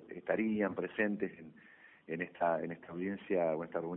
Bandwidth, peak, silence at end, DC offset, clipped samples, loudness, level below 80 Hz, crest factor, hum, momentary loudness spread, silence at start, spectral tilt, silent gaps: 3.9 kHz; -18 dBFS; 0 s; under 0.1%; under 0.1%; -36 LUFS; -74 dBFS; 18 dB; none; 9 LU; 0 s; -6 dB/octave; none